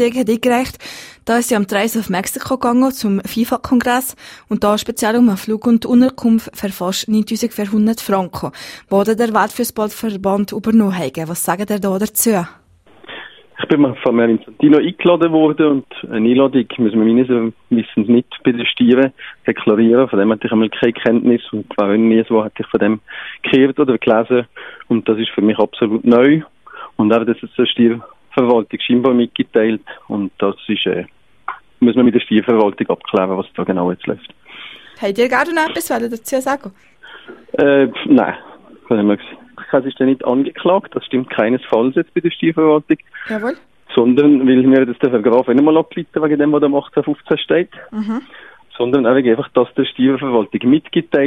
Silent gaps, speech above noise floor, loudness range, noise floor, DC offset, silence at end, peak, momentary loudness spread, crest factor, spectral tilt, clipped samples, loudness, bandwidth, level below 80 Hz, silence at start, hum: none; 27 dB; 4 LU; -41 dBFS; under 0.1%; 0 s; 0 dBFS; 12 LU; 16 dB; -5.5 dB/octave; under 0.1%; -15 LUFS; 16 kHz; -54 dBFS; 0 s; none